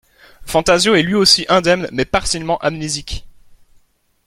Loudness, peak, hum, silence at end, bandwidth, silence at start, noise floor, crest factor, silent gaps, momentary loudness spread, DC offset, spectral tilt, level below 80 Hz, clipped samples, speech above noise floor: -15 LUFS; 0 dBFS; none; 1 s; 16 kHz; 0.4 s; -55 dBFS; 18 dB; none; 12 LU; under 0.1%; -3.5 dB/octave; -38 dBFS; under 0.1%; 40 dB